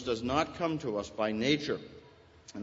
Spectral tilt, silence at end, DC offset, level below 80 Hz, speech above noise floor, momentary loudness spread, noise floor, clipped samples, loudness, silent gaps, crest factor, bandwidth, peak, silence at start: -5 dB/octave; 0 s; under 0.1%; -58 dBFS; 25 dB; 10 LU; -57 dBFS; under 0.1%; -32 LUFS; none; 20 dB; 8 kHz; -14 dBFS; 0 s